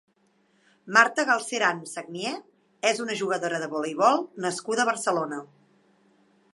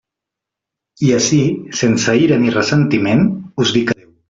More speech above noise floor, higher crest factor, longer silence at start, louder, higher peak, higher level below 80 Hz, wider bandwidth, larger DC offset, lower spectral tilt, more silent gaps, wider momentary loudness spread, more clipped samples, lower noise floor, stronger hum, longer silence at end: second, 41 dB vs 70 dB; first, 24 dB vs 14 dB; second, 0.85 s vs 1 s; second, -25 LUFS vs -15 LUFS; about the same, -2 dBFS vs -2 dBFS; second, -84 dBFS vs -50 dBFS; first, 11.5 kHz vs 7.8 kHz; neither; second, -2.5 dB/octave vs -5 dB/octave; neither; first, 13 LU vs 5 LU; neither; second, -66 dBFS vs -83 dBFS; neither; first, 1.1 s vs 0.35 s